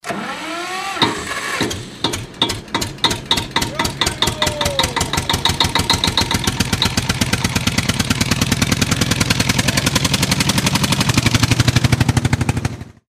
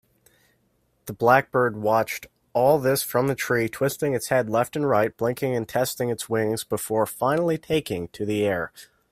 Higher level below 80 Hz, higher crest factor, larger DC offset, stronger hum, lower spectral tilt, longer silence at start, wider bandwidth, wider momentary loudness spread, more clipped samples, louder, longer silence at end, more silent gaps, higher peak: first, -32 dBFS vs -60 dBFS; second, 16 dB vs 22 dB; neither; neither; second, -3.5 dB/octave vs -5 dB/octave; second, 0.05 s vs 1.05 s; about the same, 16 kHz vs 16 kHz; second, 7 LU vs 10 LU; neither; first, -17 LUFS vs -24 LUFS; about the same, 0.2 s vs 0.3 s; neither; about the same, 0 dBFS vs -2 dBFS